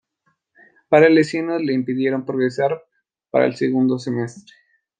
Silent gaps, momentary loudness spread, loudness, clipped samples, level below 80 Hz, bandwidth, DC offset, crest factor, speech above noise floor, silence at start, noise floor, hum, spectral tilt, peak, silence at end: none; 11 LU; -19 LUFS; under 0.1%; -68 dBFS; 9.4 kHz; under 0.1%; 18 dB; 51 dB; 0.9 s; -69 dBFS; none; -7 dB/octave; -2 dBFS; 0.6 s